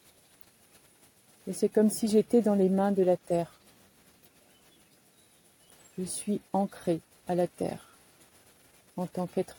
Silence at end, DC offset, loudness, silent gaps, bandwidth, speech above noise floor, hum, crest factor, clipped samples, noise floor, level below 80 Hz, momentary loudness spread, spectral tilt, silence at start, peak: 0.05 s; under 0.1%; -29 LUFS; none; 17.5 kHz; 35 dB; none; 18 dB; under 0.1%; -62 dBFS; -70 dBFS; 15 LU; -6.5 dB/octave; 1.45 s; -12 dBFS